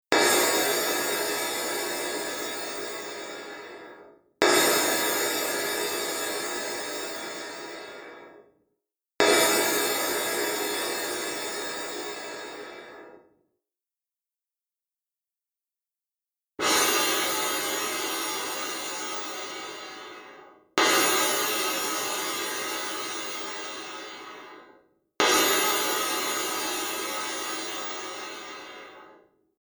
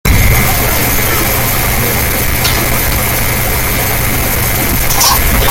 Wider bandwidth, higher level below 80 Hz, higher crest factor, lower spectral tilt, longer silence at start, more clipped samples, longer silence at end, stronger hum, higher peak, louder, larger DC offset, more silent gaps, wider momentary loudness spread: first, over 20 kHz vs 17.5 kHz; second, -68 dBFS vs -18 dBFS; first, 28 dB vs 10 dB; second, -0.5 dB/octave vs -3 dB/octave; about the same, 0.1 s vs 0.05 s; neither; first, 0.45 s vs 0 s; neither; about the same, 0 dBFS vs 0 dBFS; second, -26 LUFS vs -10 LUFS; neither; neither; first, 19 LU vs 4 LU